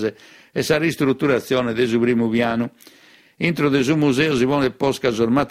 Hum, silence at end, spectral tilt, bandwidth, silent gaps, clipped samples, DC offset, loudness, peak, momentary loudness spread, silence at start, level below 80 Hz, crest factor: none; 0 s; -6 dB/octave; 16 kHz; none; under 0.1%; under 0.1%; -19 LUFS; -4 dBFS; 7 LU; 0 s; -52 dBFS; 16 dB